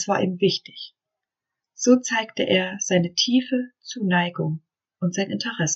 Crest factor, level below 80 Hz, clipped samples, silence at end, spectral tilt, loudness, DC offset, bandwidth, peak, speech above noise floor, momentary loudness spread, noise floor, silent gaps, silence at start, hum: 18 dB; -68 dBFS; under 0.1%; 0 s; -4 dB/octave; -23 LUFS; under 0.1%; 8 kHz; -4 dBFS; 64 dB; 12 LU; -86 dBFS; none; 0 s; none